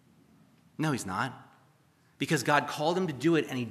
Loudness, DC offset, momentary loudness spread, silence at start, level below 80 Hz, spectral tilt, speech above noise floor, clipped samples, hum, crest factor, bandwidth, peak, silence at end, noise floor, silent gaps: -30 LUFS; under 0.1%; 10 LU; 0.8 s; -76 dBFS; -5 dB/octave; 36 dB; under 0.1%; none; 22 dB; 15 kHz; -8 dBFS; 0 s; -65 dBFS; none